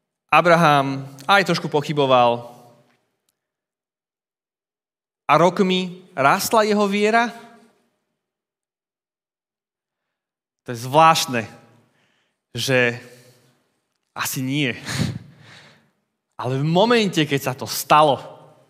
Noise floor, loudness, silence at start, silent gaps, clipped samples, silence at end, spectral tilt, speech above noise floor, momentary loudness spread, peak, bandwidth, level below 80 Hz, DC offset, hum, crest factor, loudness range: under -90 dBFS; -18 LUFS; 0.3 s; none; under 0.1%; 0.35 s; -4.5 dB/octave; over 72 dB; 14 LU; 0 dBFS; 16 kHz; -66 dBFS; under 0.1%; none; 20 dB; 8 LU